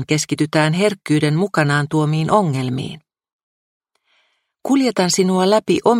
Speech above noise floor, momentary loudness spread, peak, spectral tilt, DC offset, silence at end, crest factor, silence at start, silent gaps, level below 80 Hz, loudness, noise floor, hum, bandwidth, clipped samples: 47 dB; 7 LU; 0 dBFS; -5.5 dB/octave; under 0.1%; 0 s; 18 dB; 0 s; 3.33-3.80 s; -58 dBFS; -17 LUFS; -64 dBFS; none; 16 kHz; under 0.1%